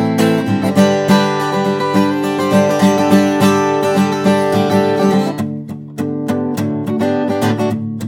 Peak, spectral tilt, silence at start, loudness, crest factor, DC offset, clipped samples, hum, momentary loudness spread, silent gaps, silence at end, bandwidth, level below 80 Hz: 0 dBFS; -6 dB/octave; 0 s; -14 LUFS; 14 dB; under 0.1%; under 0.1%; none; 7 LU; none; 0 s; 16.5 kHz; -62 dBFS